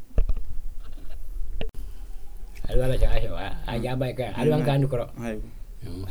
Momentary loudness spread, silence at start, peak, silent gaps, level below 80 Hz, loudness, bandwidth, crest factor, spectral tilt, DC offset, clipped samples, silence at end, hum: 21 LU; 0 s; -6 dBFS; none; -28 dBFS; -28 LUFS; 12 kHz; 18 dB; -7.5 dB/octave; under 0.1%; under 0.1%; 0 s; none